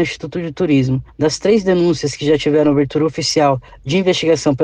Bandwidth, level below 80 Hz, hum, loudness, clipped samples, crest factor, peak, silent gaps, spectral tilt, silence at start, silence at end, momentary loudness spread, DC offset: 10 kHz; -44 dBFS; none; -16 LUFS; under 0.1%; 12 dB; -4 dBFS; none; -5.5 dB/octave; 0 s; 0 s; 7 LU; under 0.1%